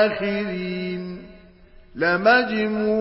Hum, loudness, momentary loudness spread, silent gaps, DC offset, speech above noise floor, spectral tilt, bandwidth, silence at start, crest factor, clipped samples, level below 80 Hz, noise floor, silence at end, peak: none; -21 LUFS; 18 LU; none; under 0.1%; 27 dB; -10 dB/octave; 5.8 kHz; 0 s; 18 dB; under 0.1%; -54 dBFS; -48 dBFS; 0 s; -6 dBFS